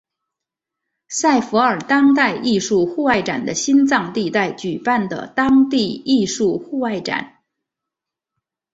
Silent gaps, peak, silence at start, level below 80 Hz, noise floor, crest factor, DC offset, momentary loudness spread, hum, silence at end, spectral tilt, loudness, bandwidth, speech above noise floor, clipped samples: none; -2 dBFS; 1.1 s; -56 dBFS; -84 dBFS; 18 dB; under 0.1%; 8 LU; none; 1.45 s; -4 dB/octave; -17 LUFS; 8 kHz; 67 dB; under 0.1%